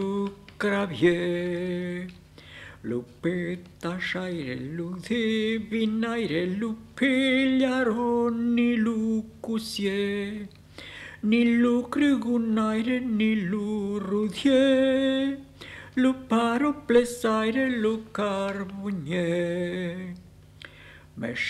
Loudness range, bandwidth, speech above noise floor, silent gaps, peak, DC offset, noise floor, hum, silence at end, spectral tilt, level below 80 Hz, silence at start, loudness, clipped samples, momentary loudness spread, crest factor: 6 LU; 12.5 kHz; 24 dB; none; -8 dBFS; under 0.1%; -49 dBFS; 50 Hz at -55 dBFS; 0 s; -6 dB/octave; -58 dBFS; 0 s; -26 LUFS; under 0.1%; 15 LU; 18 dB